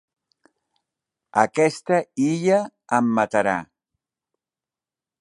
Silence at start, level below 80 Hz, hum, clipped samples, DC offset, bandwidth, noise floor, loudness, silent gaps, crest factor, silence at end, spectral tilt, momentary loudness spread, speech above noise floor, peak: 1.35 s; -66 dBFS; none; under 0.1%; under 0.1%; 11.5 kHz; under -90 dBFS; -21 LUFS; none; 22 dB; 1.55 s; -6 dB/octave; 5 LU; over 70 dB; -2 dBFS